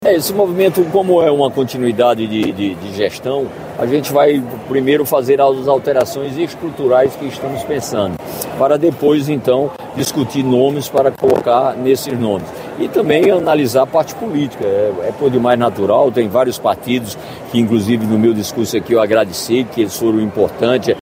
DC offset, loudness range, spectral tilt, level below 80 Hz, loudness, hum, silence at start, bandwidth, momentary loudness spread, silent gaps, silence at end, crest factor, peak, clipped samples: under 0.1%; 2 LU; -5.5 dB/octave; -54 dBFS; -15 LUFS; none; 0 s; 16 kHz; 8 LU; none; 0 s; 14 dB; 0 dBFS; under 0.1%